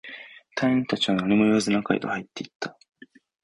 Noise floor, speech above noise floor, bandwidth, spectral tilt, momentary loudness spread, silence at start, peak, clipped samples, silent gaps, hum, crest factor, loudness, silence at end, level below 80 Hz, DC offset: -44 dBFS; 20 dB; 11.5 kHz; -5 dB/octave; 16 LU; 0.05 s; -8 dBFS; under 0.1%; 2.55-2.60 s; none; 16 dB; -24 LUFS; 0.75 s; -60 dBFS; under 0.1%